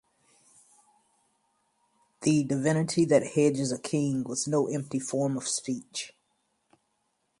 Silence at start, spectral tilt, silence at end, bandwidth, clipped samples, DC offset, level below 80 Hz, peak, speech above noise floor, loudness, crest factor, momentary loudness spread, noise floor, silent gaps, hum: 2.2 s; -5 dB/octave; 1.3 s; 11.5 kHz; under 0.1%; under 0.1%; -70 dBFS; -8 dBFS; 49 dB; -28 LUFS; 22 dB; 10 LU; -76 dBFS; none; none